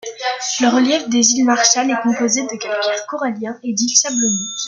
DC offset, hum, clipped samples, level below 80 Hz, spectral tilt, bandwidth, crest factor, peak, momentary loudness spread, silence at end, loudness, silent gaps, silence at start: under 0.1%; none; under 0.1%; -66 dBFS; -1.5 dB/octave; 10 kHz; 16 dB; 0 dBFS; 10 LU; 0 s; -16 LUFS; none; 0.05 s